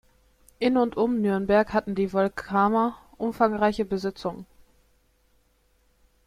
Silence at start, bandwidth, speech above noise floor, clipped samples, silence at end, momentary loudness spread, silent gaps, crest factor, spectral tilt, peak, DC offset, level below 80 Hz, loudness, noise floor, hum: 0.6 s; 14 kHz; 41 dB; under 0.1%; 1.85 s; 10 LU; none; 18 dB; -7 dB/octave; -8 dBFS; under 0.1%; -54 dBFS; -25 LUFS; -65 dBFS; none